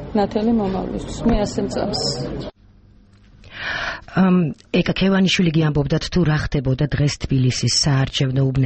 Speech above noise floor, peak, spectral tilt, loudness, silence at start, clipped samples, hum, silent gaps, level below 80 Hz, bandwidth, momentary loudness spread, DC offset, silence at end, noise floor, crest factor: 31 dB; -6 dBFS; -5.5 dB/octave; -19 LUFS; 0 s; under 0.1%; none; none; -34 dBFS; 8.8 kHz; 9 LU; under 0.1%; 0 s; -49 dBFS; 14 dB